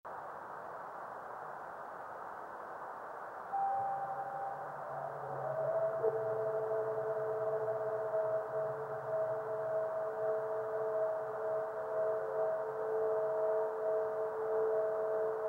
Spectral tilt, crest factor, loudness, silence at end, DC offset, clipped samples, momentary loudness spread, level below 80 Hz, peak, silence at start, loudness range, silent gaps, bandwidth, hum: -7 dB/octave; 18 dB; -37 LUFS; 0 s; under 0.1%; under 0.1%; 11 LU; -80 dBFS; -20 dBFS; 0.05 s; 6 LU; none; 15.5 kHz; none